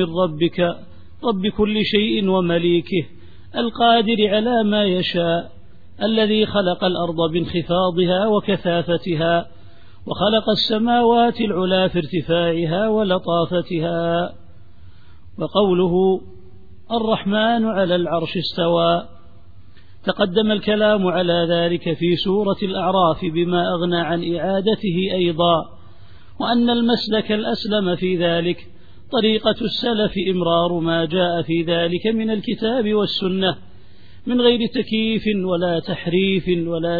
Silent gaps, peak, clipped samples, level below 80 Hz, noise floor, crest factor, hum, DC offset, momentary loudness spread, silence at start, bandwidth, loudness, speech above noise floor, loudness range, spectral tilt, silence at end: none; -2 dBFS; under 0.1%; -48 dBFS; -47 dBFS; 18 dB; none; 1%; 6 LU; 0 s; 5 kHz; -19 LUFS; 29 dB; 2 LU; -8 dB/octave; 0 s